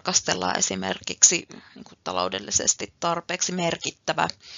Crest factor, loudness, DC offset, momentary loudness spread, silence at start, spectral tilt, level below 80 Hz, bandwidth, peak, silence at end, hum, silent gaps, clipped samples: 26 dB; -23 LUFS; under 0.1%; 12 LU; 0.05 s; -1.5 dB/octave; -62 dBFS; 7.8 kHz; 0 dBFS; 0 s; none; none; under 0.1%